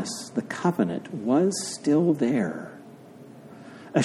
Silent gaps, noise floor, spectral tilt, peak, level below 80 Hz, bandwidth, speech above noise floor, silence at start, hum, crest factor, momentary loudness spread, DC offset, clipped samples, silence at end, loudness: none; -46 dBFS; -5.5 dB/octave; -6 dBFS; -72 dBFS; 14 kHz; 22 dB; 0 s; none; 20 dB; 23 LU; under 0.1%; under 0.1%; 0 s; -25 LUFS